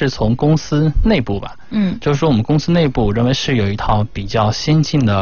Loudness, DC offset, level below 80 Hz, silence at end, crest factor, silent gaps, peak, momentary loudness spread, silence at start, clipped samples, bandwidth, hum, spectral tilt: -16 LUFS; 2%; -26 dBFS; 0 s; 12 dB; none; -2 dBFS; 5 LU; 0 s; under 0.1%; 7 kHz; none; -6.5 dB/octave